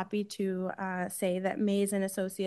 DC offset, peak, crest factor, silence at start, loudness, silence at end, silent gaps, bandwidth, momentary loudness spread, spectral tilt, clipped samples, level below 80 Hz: under 0.1%; -18 dBFS; 14 dB; 0 s; -32 LUFS; 0 s; none; 12.5 kHz; 5 LU; -5.5 dB/octave; under 0.1%; -78 dBFS